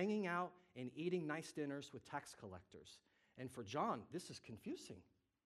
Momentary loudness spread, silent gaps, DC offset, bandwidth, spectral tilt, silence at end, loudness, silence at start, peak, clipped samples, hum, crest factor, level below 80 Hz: 18 LU; none; under 0.1%; 13.5 kHz; -5.5 dB/octave; 0.45 s; -47 LUFS; 0 s; -28 dBFS; under 0.1%; none; 20 dB; -84 dBFS